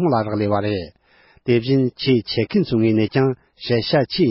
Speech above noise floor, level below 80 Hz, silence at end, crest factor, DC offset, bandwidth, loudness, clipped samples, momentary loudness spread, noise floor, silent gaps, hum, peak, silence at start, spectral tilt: 36 dB; -50 dBFS; 0 s; 14 dB; under 0.1%; 5.8 kHz; -19 LUFS; under 0.1%; 8 LU; -54 dBFS; none; none; -6 dBFS; 0 s; -11 dB/octave